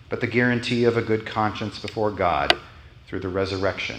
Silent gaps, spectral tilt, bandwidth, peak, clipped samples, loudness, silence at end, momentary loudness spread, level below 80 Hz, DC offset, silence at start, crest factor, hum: none; -5.5 dB/octave; 12 kHz; 0 dBFS; under 0.1%; -23 LUFS; 0 s; 9 LU; -50 dBFS; under 0.1%; 0 s; 24 dB; none